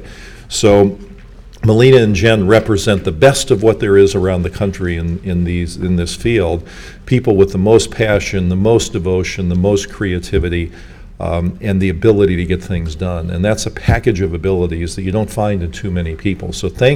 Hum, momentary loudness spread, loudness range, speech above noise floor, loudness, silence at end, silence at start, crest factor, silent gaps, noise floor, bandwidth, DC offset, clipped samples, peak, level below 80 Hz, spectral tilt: none; 10 LU; 6 LU; 22 dB; -14 LUFS; 0 s; 0 s; 14 dB; none; -35 dBFS; 15.5 kHz; under 0.1%; 0.2%; 0 dBFS; -30 dBFS; -6 dB/octave